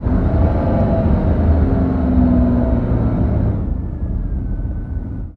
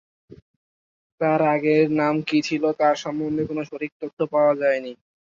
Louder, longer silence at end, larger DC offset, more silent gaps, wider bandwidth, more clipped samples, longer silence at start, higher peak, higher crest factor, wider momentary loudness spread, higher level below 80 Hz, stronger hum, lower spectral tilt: first, -17 LUFS vs -22 LUFS; second, 0 s vs 0.25 s; neither; second, none vs 0.42-1.18 s, 3.92-4.00 s, 4.13-4.17 s; second, 4.3 kHz vs 7.6 kHz; neither; second, 0 s vs 0.3 s; first, -2 dBFS vs -6 dBFS; about the same, 12 dB vs 16 dB; about the same, 9 LU vs 10 LU; first, -20 dBFS vs -64 dBFS; neither; first, -12 dB/octave vs -6.5 dB/octave